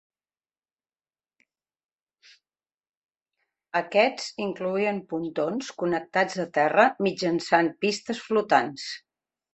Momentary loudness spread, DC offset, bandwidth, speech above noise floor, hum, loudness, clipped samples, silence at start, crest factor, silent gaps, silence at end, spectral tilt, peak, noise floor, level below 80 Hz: 10 LU; under 0.1%; 8.4 kHz; over 65 dB; none; -25 LUFS; under 0.1%; 3.75 s; 22 dB; none; 0.55 s; -4.5 dB/octave; -4 dBFS; under -90 dBFS; -72 dBFS